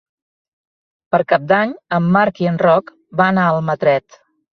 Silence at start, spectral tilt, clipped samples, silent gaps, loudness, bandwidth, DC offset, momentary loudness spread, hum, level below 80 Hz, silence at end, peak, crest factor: 1.1 s; -8.5 dB/octave; under 0.1%; none; -16 LUFS; 6.4 kHz; under 0.1%; 5 LU; none; -58 dBFS; 0.55 s; -2 dBFS; 16 dB